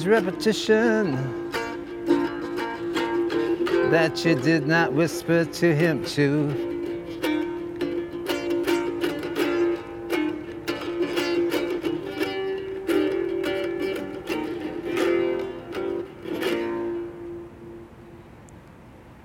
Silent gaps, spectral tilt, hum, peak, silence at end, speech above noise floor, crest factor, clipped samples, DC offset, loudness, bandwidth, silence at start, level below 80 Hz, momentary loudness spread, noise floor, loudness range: none; -6 dB/octave; none; -6 dBFS; 0 s; 25 dB; 18 dB; under 0.1%; under 0.1%; -25 LUFS; 17 kHz; 0 s; -56 dBFS; 11 LU; -46 dBFS; 6 LU